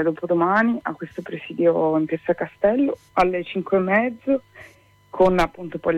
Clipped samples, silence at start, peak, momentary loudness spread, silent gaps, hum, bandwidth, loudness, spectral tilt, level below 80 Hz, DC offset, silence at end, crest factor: under 0.1%; 0 s; -6 dBFS; 12 LU; none; none; 12 kHz; -21 LUFS; -7.5 dB/octave; -46 dBFS; under 0.1%; 0 s; 16 dB